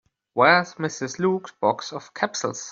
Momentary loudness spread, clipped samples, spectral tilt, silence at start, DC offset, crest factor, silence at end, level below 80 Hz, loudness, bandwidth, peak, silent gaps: 13 LU; under 0.1%; -4 dB/octave; 0.35 s; under 0.1%; 20 dB; 0 s; -68 dBFS; -23 LUFS; 7.8 kHz; -2 dBFS; none